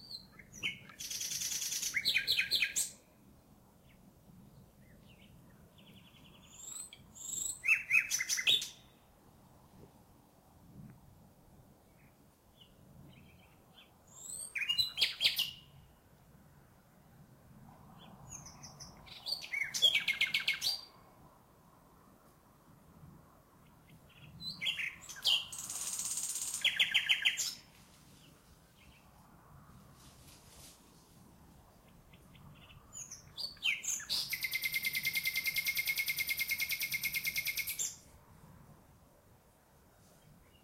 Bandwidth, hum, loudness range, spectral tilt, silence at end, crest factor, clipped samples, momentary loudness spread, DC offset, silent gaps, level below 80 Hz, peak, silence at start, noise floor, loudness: 16.5 kHz; none; 15 LU; 1 dB/octave; 0.3 s; 24 dB; under 0.1%; 22 LU; under 0.1%; none; -68 dBFS; -16 dBFS; 0 s; -65 dBFS; -33 LUFS